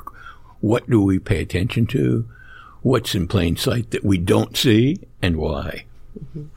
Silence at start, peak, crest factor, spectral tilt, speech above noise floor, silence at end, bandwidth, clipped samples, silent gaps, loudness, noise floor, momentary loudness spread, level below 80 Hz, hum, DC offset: 0.05 s; -4 dBFS; 16 dB; -6 dB/octave; 21 dB; 0.05 s; 16.5 kHz; under 0.1%; none; -20 LUFS; -41 dBFS; 16 LU; -38 dBFS; none; under 0.1%